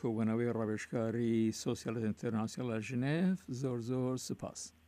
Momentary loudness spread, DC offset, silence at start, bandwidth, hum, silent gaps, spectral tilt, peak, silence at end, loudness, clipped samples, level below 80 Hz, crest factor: 6 LU; under 0.1%; 0 s; 15 kHz; none; none; -6.5 dB/octave; -22 dBFS; 0.2 s; -36 LUFS; under 0.1%; -70 dBFS; 12 dB